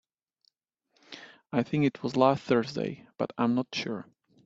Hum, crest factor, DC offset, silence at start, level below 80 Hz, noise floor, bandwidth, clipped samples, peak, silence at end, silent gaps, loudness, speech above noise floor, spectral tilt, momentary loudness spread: none; 22 dB; under 0.1%; 1.1 s; -70 dBFS; -75 dBFS; 7.8 kHz; under 0.1%; -8 dBFS; 0.45 s; none; -29 LUFS; 47 dB; -6.5 dB/octave; 21 LU